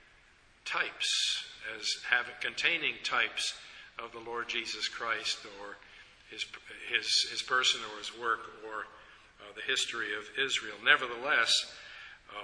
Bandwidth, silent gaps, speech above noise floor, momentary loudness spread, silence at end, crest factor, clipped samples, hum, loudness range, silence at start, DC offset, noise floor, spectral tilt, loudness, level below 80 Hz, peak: 11 kHz; none; 29 dB; 18 LU; 0 s; 26 dB; under 0.1%; none; 5 LU; 0.65 s; under 0.1%; -62 dBFS; 0.5 dB/octave; -31 LUFS; -70 dBFS; -8 dBFS